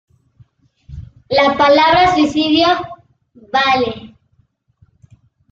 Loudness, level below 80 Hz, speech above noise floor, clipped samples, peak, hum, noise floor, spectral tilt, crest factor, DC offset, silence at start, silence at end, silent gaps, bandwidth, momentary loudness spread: -13 LUFS; -46 dBFS; 47 dB; under 0.1%; -2 dBFS; none; -59 dBFS; -4.5 dB/octave; 16 dB; under 0.1%; 0.9 s; 1.45 s; none; 7.6 kHz; 23 LU